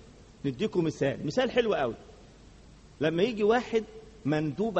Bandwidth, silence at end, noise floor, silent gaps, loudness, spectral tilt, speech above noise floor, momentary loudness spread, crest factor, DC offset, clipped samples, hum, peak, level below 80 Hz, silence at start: 8.4 kHz; 0 s; -53 dBFS; none; -29 LUFS; -6.5 dB/octave; 25 dB; 10 LU; 18 dB; under 0.1%; under 0.1%; none; -12 dBFS; -56 dBFS; 0.05 s